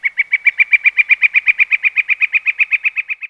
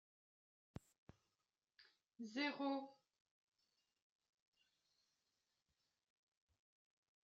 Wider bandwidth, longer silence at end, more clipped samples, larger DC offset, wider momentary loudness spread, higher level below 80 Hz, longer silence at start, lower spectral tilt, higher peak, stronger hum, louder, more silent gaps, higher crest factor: about the same, 7.6 kHz vs 7.4 kHz; second, 0 s vs 4.3 s; neither; neither; second, 4 LU vs 19 LU; first, -70 dBFS vs -84 dBFS; second, 0 s vs 1.8 s; second, 2 dB/octave vs -2.5 dB/octave; first, 0 dBFS vs -32 dBFS; neither; first, -11 LUFS vs -45 LUFS; neither; second, 14 dB vs 24 dB